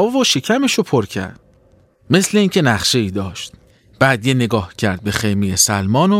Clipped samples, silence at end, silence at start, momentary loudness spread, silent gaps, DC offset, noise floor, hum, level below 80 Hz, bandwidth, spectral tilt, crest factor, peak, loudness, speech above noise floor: under 0.1%; 0 s; 0 s; 11 LU; none; under 0.1%; -52 dBFS; none; -48 dBFS; 16.5 kHz; -4 dB/octave; 16 dB; 0 dBFS; -16 LUFS; 36 dB